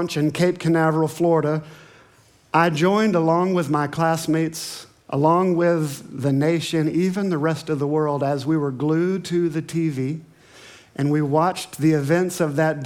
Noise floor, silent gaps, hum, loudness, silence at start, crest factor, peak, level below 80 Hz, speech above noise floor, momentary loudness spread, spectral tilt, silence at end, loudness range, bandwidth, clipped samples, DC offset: -54 dBFS; none; none; -21 LUFS; 0 s; 18 dB; -2 dBFS; -66 dBFS; 34 dB; 8 LU; -6.5 dB/octave; 0 s; 3 LU; 17.5 kHz; under 0.1%; under 0.1%